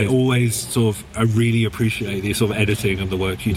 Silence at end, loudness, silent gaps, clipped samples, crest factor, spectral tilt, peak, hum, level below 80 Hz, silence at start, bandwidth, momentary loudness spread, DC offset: 0 s; -20 LUFS; none; under 0.1%; 16 dB; -5.5 dB/octave; -2 dBFS; none; -42 dBFS; 0 s; 16.5 kHz; 5 LU; under 0.1%